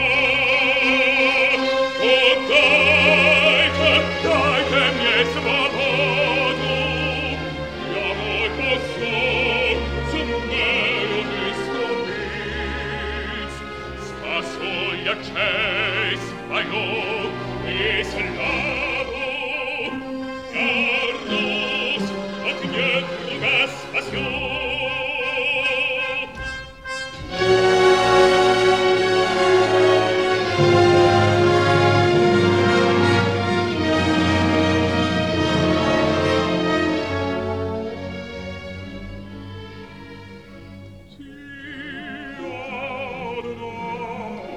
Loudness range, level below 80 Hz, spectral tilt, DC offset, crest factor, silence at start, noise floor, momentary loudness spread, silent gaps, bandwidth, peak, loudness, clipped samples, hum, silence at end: 15 LU; -42 dBFS; -5 dB/octave; 0.2%; 18 dB; 0 s; -41 dBFS; 16 LU; none; 12 kHz; -2 dBFS; -19 LUFS; under 0.1%; none; 0 s